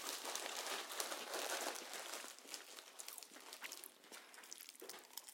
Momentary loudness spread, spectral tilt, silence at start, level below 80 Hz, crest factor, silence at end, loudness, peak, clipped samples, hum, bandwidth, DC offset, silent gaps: 12 LU; 1.5 dB/octave; 0 s; under -90 dBFS; 32 dB; 0 s; -47 LUFS; -18 dBFS; under 0.1%; none; 17 kHz; under 0.1%; none